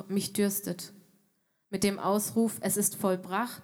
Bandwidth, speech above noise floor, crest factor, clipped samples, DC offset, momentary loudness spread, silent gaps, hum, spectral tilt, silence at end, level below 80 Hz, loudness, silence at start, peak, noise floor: 18 kHz; 44 dB; 18 dB; under 0.1%; under 0.1%; 11 LU; none; none; -4 dB/octave; 0 s; -72 dBFS; -29 LUFS; 0 s; -12 dBFS; -73 dBFS